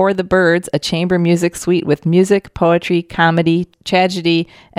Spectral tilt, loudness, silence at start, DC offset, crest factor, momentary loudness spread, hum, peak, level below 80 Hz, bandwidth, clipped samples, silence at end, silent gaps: -6 dB/octave; -15 LUFS; 0 s; under 0.1%; 14 dB; 4 LU; none; 0 dBFS; -46 dBFS; 13.5 kHz; under 0.1%; 0.35 s; none